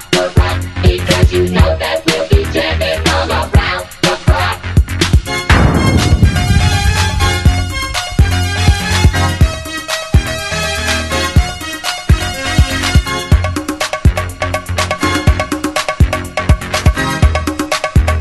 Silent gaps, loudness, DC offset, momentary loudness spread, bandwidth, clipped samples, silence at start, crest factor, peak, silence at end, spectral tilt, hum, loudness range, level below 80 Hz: none; -13 LUFS; under 0.1%; 6 LU; 12.5 kHz; under 0.1%; 0 s; 12 dB; 0 dBFS; 0 s; -5 dB/octave; none; 3 LU; -18 dBFS